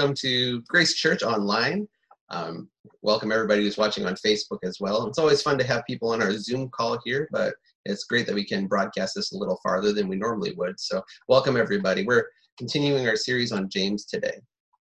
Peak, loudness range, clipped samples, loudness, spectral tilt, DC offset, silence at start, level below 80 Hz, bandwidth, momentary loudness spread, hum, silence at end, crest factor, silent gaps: -6 dBFS; 3 LU; under 0.1%; -25 LUFS; -4.5 dB/octave; under 0.1%; 0 s; -62 dBFS; 10.5 kHz; 10 LU; none; 0.45 s; 20 dB; 2.21-2.27 s, 2.79-2.84 s, 7.75-7.84 s, 12.52-12.57 s